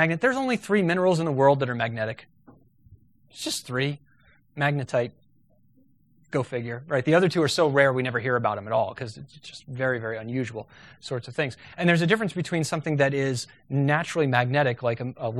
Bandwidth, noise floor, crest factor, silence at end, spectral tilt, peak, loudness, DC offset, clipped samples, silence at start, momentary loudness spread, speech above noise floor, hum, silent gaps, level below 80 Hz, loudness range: 13.5 kHz; -63 dBFS; 22 dB; 0 s; -5.5 dB/octave; -4 dBFS; -25 LUFS; under 0.1%; under 0.1%; 0 s; 13 LU; 39 dB; none; none; -64 dBFS; 7 LU